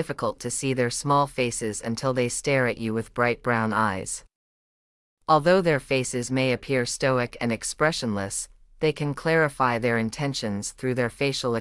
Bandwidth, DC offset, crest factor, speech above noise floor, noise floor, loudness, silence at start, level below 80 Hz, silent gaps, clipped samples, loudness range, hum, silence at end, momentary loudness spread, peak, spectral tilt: 12 kHz; under 0.1%; 18 dB; over 65 dB; under -90 dBFS; -25 LUFS; 0 s; -52 dBFS; 4.35-5.17 s; under 0.1%; 2 LU; none; 0 s; 7 LU; -6 dBFS; -4.5 dB/octave